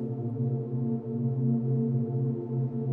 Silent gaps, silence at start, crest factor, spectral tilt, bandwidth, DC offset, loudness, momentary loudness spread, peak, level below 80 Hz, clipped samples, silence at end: none; 0 s; 12 dB; -14.5 dB/octave; 1.5 kHz; under 0.1%; -30 LUFS; 4 LU; -16 dBFS; -68 dBFS; under 0.1%; 0 s